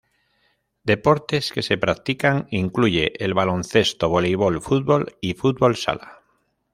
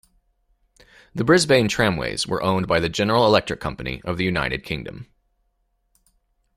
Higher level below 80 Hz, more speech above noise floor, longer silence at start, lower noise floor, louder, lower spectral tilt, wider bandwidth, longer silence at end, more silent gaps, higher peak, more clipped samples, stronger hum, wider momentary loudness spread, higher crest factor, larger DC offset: about the same, -50 dBFS vs -46 dBFS; about the same, 47 dB vs 49 dB; second, 0.85 s vs 1.15 s; about the same, -67 dBFS vs -69 dBFS; about the same, -21 LUFS vs -21 LUFS; about the same, -5.5 dB/octave vs -4.5 dB/octave; about the same, 15.5 kHz vs 15 kHz; second, 0.6 s vs 1.55 s; neither; about the same, -2 dBFS vs -2 dBFS; neither; neither; second, 5 LU vs 14 LU; about the same, 20 dB vs 20 dB; neither